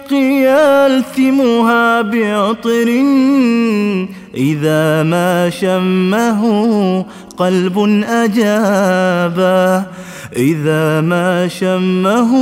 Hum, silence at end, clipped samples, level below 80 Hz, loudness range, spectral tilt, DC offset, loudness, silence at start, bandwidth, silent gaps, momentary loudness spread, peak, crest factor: none; 0 s; under 0.1%; -56 dBFS; 2 LU; -6.5 dB/octave; under 0.1%; -13 LUFS; 0 s; 16 kHz; none; 6 LU; 0 dBFS; 12 dB